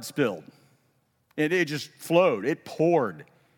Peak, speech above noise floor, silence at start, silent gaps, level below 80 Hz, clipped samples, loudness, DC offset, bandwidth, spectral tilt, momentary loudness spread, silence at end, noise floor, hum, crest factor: -8 dBFS; 44 dB; 0 s; none; -84 dBFS; under 0.1%; -26 LUFS; under 0.1%; 17.5 kHz; -5.5 dB/octave; 11 LU; 0.35 s; -69 dBFS; none; 18 dB